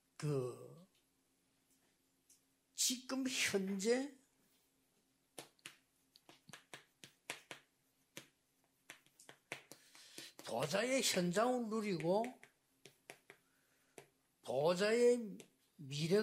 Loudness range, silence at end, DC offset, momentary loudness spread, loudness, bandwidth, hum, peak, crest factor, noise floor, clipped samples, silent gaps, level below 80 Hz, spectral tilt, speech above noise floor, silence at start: 18 LU; 0 s; under 0.1%; 24 LU; -38 LUFS; 16 kHz; none; -22 dBFS; 20 dB; -79 dBFS; under 0.1%; none; -86 dBFS; -3.5 dB/octave; 42 dB; 0.2 s